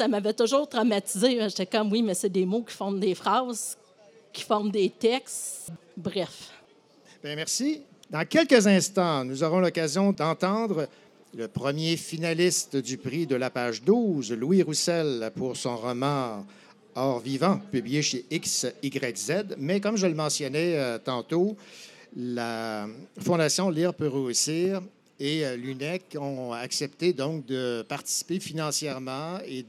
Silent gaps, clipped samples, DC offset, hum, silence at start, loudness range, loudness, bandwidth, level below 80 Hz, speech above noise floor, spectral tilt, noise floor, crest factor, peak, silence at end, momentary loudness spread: none; under 0.1%; under 0.1%; none; 0 s; 6 LU; -27 LUFS; 16 kHz; -76 dBFS; 31 dB; -4.5 dB/octave; -58 dBFS; 22 dB; -4 dBFS; 0 s; 11 LU